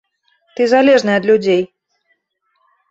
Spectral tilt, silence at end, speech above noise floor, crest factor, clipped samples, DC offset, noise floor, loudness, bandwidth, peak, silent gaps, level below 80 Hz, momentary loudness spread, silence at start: -5.5 dB/octave; 1.25 s; 54 dB; 14 dB; under 0.1%; under 0.1%; -66 dBFS; -13 LUFS; 8 kHz; -2 dBFS; none; -60 dBFS; 14 LU; 0.6 s